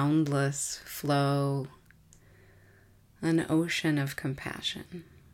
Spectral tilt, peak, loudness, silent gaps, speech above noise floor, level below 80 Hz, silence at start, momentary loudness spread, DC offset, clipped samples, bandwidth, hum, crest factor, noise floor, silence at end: -5 dB/octave; -16 dBFS; -30 LUFS; none; 30 dB; -62 dBFS; 0 s; 11 LU; under 0.1%; under 0.1%; 17 kHz; none; 14 dB; -60 dBFS; 0.3 s